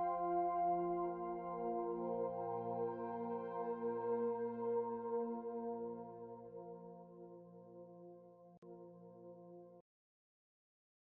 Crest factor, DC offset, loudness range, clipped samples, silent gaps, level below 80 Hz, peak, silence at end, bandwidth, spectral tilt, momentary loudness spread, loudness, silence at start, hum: 16 dB; under 0.1%; 18 LU; under 0.1%; 8.58-8.62 s; -80 dBFS; -28 dBFS; 1.35 s; 3.3 kHz; -9 dB/octave; 20 LU; -42 LUFS; 0 s; none